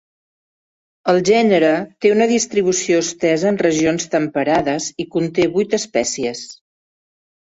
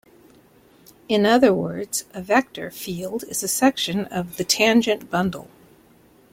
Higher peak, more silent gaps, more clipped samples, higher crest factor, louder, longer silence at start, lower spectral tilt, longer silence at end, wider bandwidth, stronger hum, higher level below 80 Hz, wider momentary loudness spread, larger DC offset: about the same, -2 dBFS vs -2 dBFS; neither; neither; about the same, 16 dB vs 20 dB; first, -17 LUFS vs -21 LUFS; about the same, 1.05 s vs 1.1 s; about the same, -4 dB/octave vs -3.5 dB/octave; about the same, 0.95 s vs 0.9 s; second, 8.2 kHz vs 16.5 kHz; neither; about the same, -56 dBFS vs -58 dBFS; second, 9 LU vs 13 LU; neither